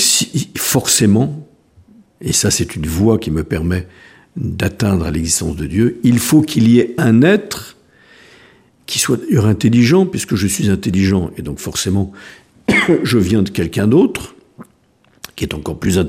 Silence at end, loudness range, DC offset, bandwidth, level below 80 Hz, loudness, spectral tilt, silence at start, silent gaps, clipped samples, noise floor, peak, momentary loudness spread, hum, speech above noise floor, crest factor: 0 s; 4 LU; under 0.1%; 16 kHz; -38 dBFS; -15 LUFS; -4.5 dB/octave; 0 s; none; under 0.1%; -54 dBFS; 0 dBFS; 13 LU; none; 40 dB; 16 dB